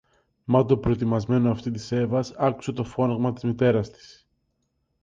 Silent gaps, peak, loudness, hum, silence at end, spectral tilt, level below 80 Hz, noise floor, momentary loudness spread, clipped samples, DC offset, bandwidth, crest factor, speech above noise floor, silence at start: none; -6 dBFS; -24 LUFS; none; 1.15 s; -8 dB/octave; -50 dBFS; -74 dBFS; 8 LU; under 0.1%; under 0.1%; 7.6 kHz; 18 dB; 50 dB; 0.5 s